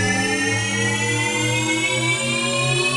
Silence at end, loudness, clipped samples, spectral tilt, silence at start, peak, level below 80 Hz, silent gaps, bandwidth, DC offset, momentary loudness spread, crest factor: 0 s; -19 LUFS; under 0.1%; -3 dB/octave; 0 s; -8 dBFS; -52 dBFS; none; 11.5 kHz; under 0.1%; 1 LU; 12 dB